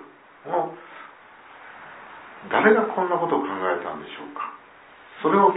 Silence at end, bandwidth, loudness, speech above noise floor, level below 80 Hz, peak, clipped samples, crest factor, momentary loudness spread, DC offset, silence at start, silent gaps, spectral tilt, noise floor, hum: 0 s; 4 kHz; -24 LUFS; 26 dB; -74 dBFS; -2 dBFS; under 0.1%; 22 dB; 25 LU; under 0.1%; 0 s; none; -9.5 dB/octave; -48 dBFS; none